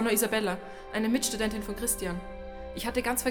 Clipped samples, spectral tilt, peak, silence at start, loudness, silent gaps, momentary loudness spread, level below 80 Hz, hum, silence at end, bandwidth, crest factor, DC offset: under 0.1%; -3 dB/octave; -14 dBFS; 0 s; -30 LUFS; none; 12 LU; -46 dBFS; none; 0 s; over 20 kHz; 16 dB; under 0.1%